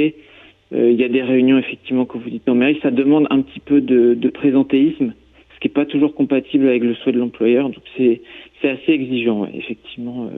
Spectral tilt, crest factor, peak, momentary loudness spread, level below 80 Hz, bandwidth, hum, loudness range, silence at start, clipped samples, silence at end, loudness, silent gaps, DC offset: -9.5 dB/octave; 12 dB; -4 dBFS; 10 LU; -58 dBFS; 3.9 kHz; none; 2 LU; 0 s; under 0.1%; 0 s; -17 LUFS; none; under 0.1%